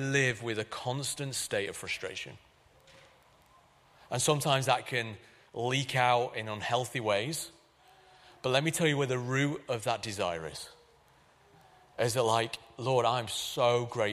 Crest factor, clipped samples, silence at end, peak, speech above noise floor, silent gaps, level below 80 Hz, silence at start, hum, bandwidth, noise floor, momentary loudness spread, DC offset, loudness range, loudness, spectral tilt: 22 dB; under 0.1%; 0 s; -10 dBFS; 32 dB; none; -68 dBFS; 0 s; none; 15 kHz; -63 dBFS; 12 LU; under 0.1%; 5 LU; -31 LUFS; -4 dB/octave